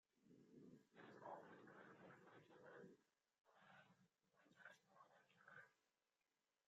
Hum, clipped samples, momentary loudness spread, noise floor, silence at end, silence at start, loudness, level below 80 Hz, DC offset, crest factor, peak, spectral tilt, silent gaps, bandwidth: none; under 0.1%; 8 LU; under -90 dBFS; 0.75 s; 0.15 s; -65 LUFS; under -90 dBFS; under 0.1%; 22 dB; -46 dBFS; -4 dB/octave; none; 7.4 kHz